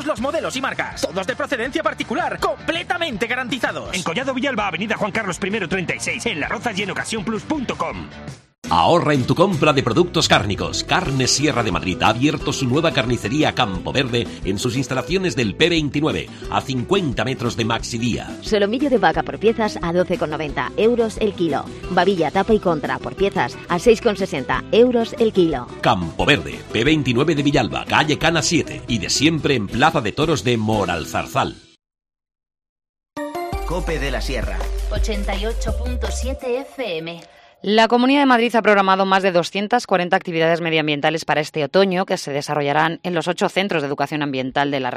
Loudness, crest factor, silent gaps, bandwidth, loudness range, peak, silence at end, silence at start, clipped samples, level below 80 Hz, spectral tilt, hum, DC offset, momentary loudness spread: -19 LUFS; 18 dB; 8.58-8.62 s, 32.69-32.76 s, 32.89-32.94 s; 14 kHz; 7 LU; -2 dBFS; 0 s; 0 s; under 0.1%; -34 dBFS; -4.5 dB/octave; none; under 0.1%; 9 LU